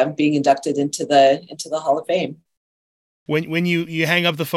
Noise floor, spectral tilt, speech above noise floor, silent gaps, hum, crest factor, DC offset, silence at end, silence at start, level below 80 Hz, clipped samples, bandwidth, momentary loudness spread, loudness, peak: under -90 dBFS; -5 dB/octave; over 71 dB; 2.57-3.26 s; none; 18 dB; under 0.1%; 0 s; 0 s; -70 dBFS; under 0.1%; 16.5 kHz; 9 LU; -19 LUFS; -2 dBFS